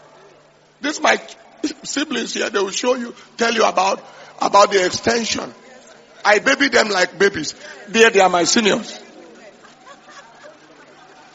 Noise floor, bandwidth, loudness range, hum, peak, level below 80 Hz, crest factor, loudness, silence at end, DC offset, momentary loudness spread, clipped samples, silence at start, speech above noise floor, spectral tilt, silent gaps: -51 dBFS; 8 kHz; 5 LU; none; 0 dBFS; -60 dBFS; 20 dB; -17 LUFS; 0.85 s; under 0.1%; 15 LU; under 0.1%; 0.8 s; 33 dB; -1 dB/octave; none